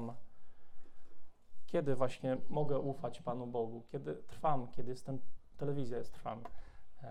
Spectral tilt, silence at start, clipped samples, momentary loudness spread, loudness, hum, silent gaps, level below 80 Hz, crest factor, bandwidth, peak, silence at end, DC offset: -8 dB/octave; 0 s; under 0.1%; 11 LU; -40 LUFS; none; none; -60 dBFS; 18 dB; 11.5 kHz; -18 dBFS; 0 s; under 0.1%